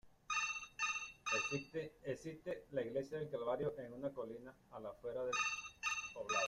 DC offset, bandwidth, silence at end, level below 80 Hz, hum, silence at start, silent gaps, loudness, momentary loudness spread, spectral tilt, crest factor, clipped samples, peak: under 0.1%; 14.5 kHz; 0 s; -72 dBFS; none; 0.05 s; none; -42 LUFS; 10 LU; -3 dB/octave; 18 dB; under 0.1%; -24 dBFS